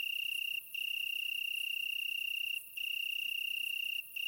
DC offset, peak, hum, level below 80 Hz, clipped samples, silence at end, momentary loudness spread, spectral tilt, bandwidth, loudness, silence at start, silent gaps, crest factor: under 0.1%; -28 dBFS; none; -84 dBFS; under 0.1%; 0 s; 2 LU; 4 dB/octave; 16.5 kHz; -35 LUFS; 0 s; none; 10 dB